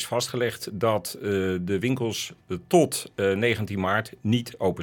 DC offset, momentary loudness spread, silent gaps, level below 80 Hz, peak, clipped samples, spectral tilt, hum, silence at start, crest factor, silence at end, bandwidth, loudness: under 0.1%; 6 LU; none; -64 dBFS; -6 dBFS; under 0.1%; -5 dB/octave; none; 0 s; 18 dB; 0 s; 19 kHz; -26 LUFS